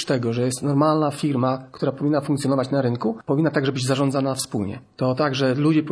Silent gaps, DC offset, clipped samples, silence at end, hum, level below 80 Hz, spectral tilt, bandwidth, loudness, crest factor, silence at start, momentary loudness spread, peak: none; under 0.1%; under 0.1%; 0 s; none; -62 dBFS; -6 dB/octave; 11 kHz; -22 LUFS; 16 dB; 0 s; 6 LU; -6 dBFS